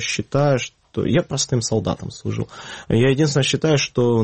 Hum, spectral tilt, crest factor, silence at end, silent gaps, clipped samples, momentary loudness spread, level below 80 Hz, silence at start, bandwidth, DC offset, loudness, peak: none; -5 dB/octave; 14 dB; 0 s; none; under 0.1%; 10 LU; -48 dBFS; 0 s; 8.8 kHz; under 0.1%; -20 LUFS; -6 dBFS